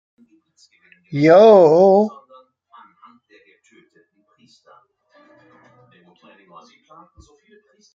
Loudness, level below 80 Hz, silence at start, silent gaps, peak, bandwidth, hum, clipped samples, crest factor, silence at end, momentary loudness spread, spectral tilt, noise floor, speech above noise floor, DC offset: -12 LUFS; -66 dBFS; 1.1 s; none; -2 dBFS; 7.4 kHz; none; under 0.1%; 18 dB; 5.85 s; 14 LU; -7.5 dB/octave; -60 dBFS; 45 dB; under 0.1%